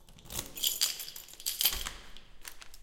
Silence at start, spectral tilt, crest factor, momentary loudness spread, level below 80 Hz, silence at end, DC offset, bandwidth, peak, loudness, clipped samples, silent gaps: 0 s; 0.5 dB/octave; 30 dB; 20 LU; -52 dBFS; 0 s; under 0.1%; 17 kHz; -8 dBFS; -32 LUFS; under 0.1%; none